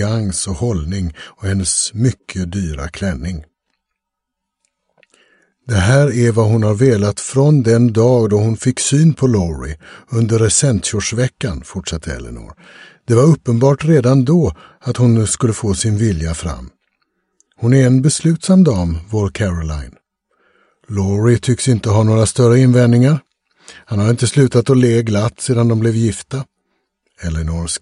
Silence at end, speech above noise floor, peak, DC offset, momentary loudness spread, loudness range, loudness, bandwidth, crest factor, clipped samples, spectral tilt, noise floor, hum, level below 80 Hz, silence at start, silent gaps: 0.05 s; 64 dB; 0 dBFS; under 0.1%; 13 LU; 7 LU; -15 LUFS; 11.5 kHz; 14 dB; under 0.1%; -6 dB/octave; -78 dBFS; none; -34 dBFS; 0 s; none